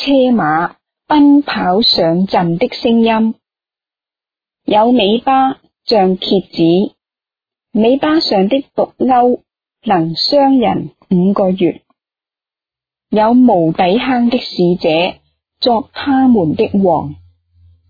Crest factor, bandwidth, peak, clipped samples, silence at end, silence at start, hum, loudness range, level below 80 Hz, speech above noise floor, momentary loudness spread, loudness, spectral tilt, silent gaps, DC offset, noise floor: 12 dB; 5 kHz; 0 dBFS; under 0.1%; 0.75 s; 0 s; none; 2 LU; -50 dBFS; 78 dB; 8 LU; -13 LUFS; -7.5 dB/octave; none; under 0.1%; -90 dBFS